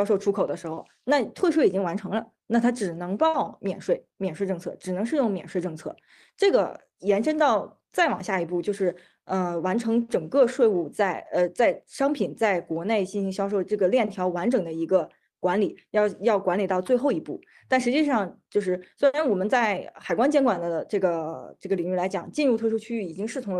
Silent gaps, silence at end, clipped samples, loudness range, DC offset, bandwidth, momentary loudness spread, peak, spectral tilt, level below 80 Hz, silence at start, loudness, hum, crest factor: none; 0 s; under 0.1%; 3 LU; under 0.1%; 12.5 kHz; 9 LU; -8 dBFS; -6 dB/octave; -70 dBFS; 0 s; -25 LUFS; none; 18 dB